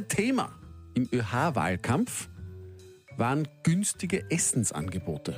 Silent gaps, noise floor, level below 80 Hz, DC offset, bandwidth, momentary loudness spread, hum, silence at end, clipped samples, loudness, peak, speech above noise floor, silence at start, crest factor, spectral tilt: none; -48 dBFS; -58 dBFS; under 0.1%; 15.5 kHz; 18 LU; none; 0 s; under 0.1%; -29 LUFS; -12 dBFS; 20 dB; 0 s; 16 dB; -4.5 dB/octave